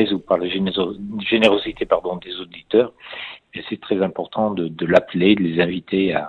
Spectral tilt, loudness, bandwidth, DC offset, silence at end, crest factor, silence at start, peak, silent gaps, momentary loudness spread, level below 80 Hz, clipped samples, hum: -7 dB/octave; -20 LUFS; 9.8 kHz; under 0.1%; 0 s; 20 dB; 0 s; 0 dBFS; none; 15 LU; -52 dBFS; under 0.1%; none